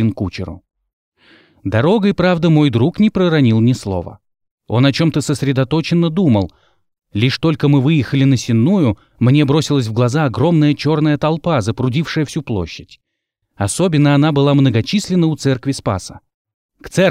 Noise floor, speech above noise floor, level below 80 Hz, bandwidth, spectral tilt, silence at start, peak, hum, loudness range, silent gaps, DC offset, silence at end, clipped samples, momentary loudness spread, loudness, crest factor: -74 dBFS; 60 dB; -46 dBFS; 14 kHz; -6.5 dB/octave; 0 s; -2 dBFS; none; 3 LU; 0.93-1.12 s, 4.51-4.58 s, 16.34-16.45 s, 16.54-16.69 s; under 0.1%; 0 s; under 0.1%; 10 LU; -15 LUFS; 14 dB